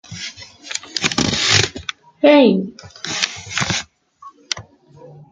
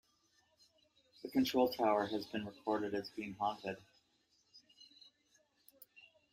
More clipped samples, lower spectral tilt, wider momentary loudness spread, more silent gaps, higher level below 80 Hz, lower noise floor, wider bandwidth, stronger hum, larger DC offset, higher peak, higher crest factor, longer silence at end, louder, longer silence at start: neither; second, -3.5 dB/octave vs -5 dB/octave; second, 18 LU vs 26 LU; neither; first, -50 dBFS vs -78 dBFS; second, -44 dBFS vs -76 dBFS; second, 9.6 kHz vs 16 kHz; neither; neither; first, 0 dBFS vs -20 dBFS; about the same, 20 dB vs 20 dB; second, 0.1 s vs 0.3 s; first, -17 LUFS vs -37 LUFS; second, 0.1 s vs 1.25 s